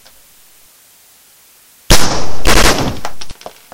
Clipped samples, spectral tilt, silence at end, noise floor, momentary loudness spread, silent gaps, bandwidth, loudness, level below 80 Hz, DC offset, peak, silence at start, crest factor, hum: 0.5%; -3 dB/octave; 0 s; -46 dBFS; 21 LU; none; over 20 kHz; -13 LUFS; -22 dBFS; under 0.1%; 0 dBFS; 0 s; 12 dB; none